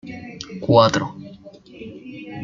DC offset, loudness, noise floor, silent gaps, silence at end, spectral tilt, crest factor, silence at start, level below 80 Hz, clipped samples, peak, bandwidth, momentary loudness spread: under 0.1%; -18 LUFS; -43 dBFS; none; 0 s; -5.5 dB/octave; 20 dB; 0.05 s; -56 dBFS; under 0.1%; -2 dBFS; 7.6 kHz; 24 LU